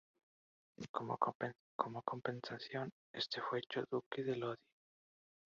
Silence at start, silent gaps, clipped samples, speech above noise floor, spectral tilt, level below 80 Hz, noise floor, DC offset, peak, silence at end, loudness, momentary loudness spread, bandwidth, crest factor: 0.8 s; 0.89-0.94 s, 1.35-1.40 s, 1.60-1.79 s, 2.92-3.14 s, 4.06-4.11 s; under 0.1%; over 47 dB; -3.5 dB/octave; -84 dBFS; under -90 dBFS; under 0.1%; -16 dBFS; 1.05 s; -43 LUFS; 7 LU; 7.4 kHz; 28 dB